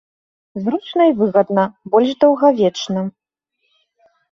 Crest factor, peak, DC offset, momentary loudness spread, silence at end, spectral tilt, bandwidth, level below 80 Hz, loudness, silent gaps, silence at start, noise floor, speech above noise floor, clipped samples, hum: 16 dB; -2 dBFS; under 0.1%; 11 LU; 1.2 s; -6.5 dB/octave; 7.4 kHz; -62 dBFS; -16 LUFS; none; 0.55 s; -71 dBFS; 55 dB; under 0.1%; none